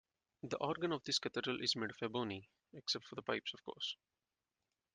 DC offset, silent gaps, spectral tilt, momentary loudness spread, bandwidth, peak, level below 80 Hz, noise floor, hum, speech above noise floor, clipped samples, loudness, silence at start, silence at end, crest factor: under 0.1%; none; -3.5 dB/octave; 10 LU; 10 kHz; -22 dBFS; -80 dBFS; under -90 dBFS; none; over 48 dB; under 0.1%; -41 LUFS; 0.45 s; 1 s; 22 dB